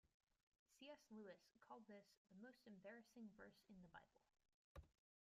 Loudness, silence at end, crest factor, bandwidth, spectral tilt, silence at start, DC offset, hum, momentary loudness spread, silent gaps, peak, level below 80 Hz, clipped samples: -65 LUFS; 0.4 s; 16 dB; 13.5 kHz; -5.5 dB/octave; 0.05 s; under 0.1%; none; 7 LU; 0.14-0.20 s, 0.43-0.52 s, 0.59-0.66 s, 2.17-2.25 s, 4.54-4.75 s; -50 dBFS; -82 dBFS; under 0.1%